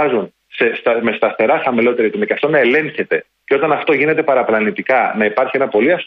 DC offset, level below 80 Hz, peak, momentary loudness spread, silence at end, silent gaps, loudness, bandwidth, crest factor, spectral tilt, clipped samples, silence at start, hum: under 0.1%; -62 dBFS; -2 dBFS; 5 LU; 0 s; none; -15 LUFS; 5.2 kHz; 14 dB; -8 dB/octave; under 0.1%; 0 s; none